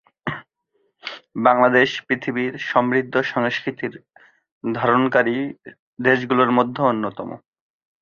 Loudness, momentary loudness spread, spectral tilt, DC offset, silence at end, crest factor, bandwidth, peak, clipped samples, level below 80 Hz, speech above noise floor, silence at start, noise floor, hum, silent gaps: -20 LUFS; 18 LU; -6.5 dB/octave; under 0.1%; 0.65 s; 20 dB; 7 kHz; -2 dBFS; under 0.1%; -64 dBFS; 49 dB; 0.25 s; -69 dBFS; none; 4.52-4.61 s, 5.79-5.97 s